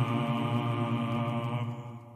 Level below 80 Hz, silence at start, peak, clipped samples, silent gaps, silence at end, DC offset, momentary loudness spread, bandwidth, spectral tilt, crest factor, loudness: -70 dBFS; 0 s; -16 dBFS; under 0.1%; none; 0 s; under 0.1%; 6 LU; 12.5 kHz; -8 dB/octave; 14 dB; -31 LUFS